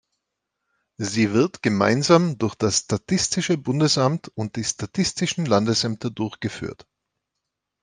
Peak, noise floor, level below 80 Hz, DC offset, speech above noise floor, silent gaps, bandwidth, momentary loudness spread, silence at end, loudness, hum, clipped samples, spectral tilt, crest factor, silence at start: -2 dBFS; -82 dBFS; -58 dBFS; under 0.1%; 60 dB; none; 10.5 kHz; 11 LU; 1.1 s; -22 LUFS; none; under 0.1%; -4.5 dB/octave; 20 dB; 1 s